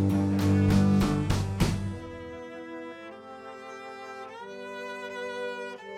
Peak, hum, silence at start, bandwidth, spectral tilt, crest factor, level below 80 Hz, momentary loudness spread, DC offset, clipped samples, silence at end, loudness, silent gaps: -10 dBFS; 60 Hz at -60 dBFS; 0 s; 15.5 kHz; -7 dB/octave; 18 dB; -42 dBFS; 19 LU; under 0.1%; under 0.1%; 0 s; -28 LUFS; none